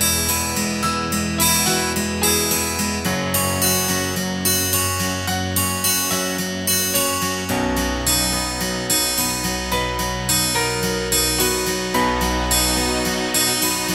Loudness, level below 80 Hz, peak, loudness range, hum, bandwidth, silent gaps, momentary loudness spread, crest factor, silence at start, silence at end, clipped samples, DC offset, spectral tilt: -19 LUFS; -36 dBFS; -4 dBFS; 1 LU; none; 16.5 kHz; none; 5 LU; 16 dB; 0 s; 0 s; under 0.1%; under 0.1%; -2.5 dB/octave